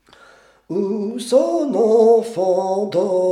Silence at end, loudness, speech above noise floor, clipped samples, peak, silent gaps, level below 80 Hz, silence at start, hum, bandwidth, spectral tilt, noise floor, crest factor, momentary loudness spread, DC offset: 0 s; -17 LUFS; 33 dB; under 0.1%; -4 dBFS; none; -68 dBFS; 0.7 s; none; 12.5 kHz; -6.5 dB/octave; -49 dBFS; 14 dB; 10 LU; under 0.1%